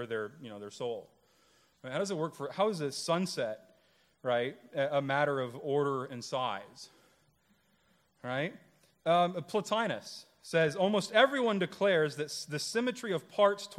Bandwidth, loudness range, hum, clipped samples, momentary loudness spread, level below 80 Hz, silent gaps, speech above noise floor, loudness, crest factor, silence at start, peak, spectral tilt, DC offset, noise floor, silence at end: 15 kHz; 7 LU; none; under 0.1%; 14 LU; -80 dBFS; none; 39 dB; -32 LUFS; 22 dB; 0 s; -10 dBFS; -4.5 dB/octave; under 0.1%; -71 dBFS; 0 s